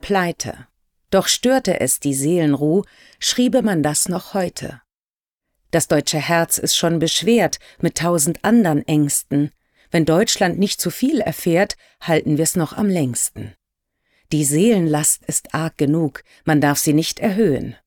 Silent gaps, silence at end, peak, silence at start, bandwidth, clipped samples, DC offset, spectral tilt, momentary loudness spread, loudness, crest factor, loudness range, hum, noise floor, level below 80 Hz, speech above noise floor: 4.99-5.24 s; 0.15 s; -6 dBFS; 0.05 s; 20 kHz; under 0.1%; under 0.1%; -4 dB/octave; 8 LU; -18 LUFS; 14 dB; 3 LU; none; under -90 dBFS; -50 dBFS; over 72 dB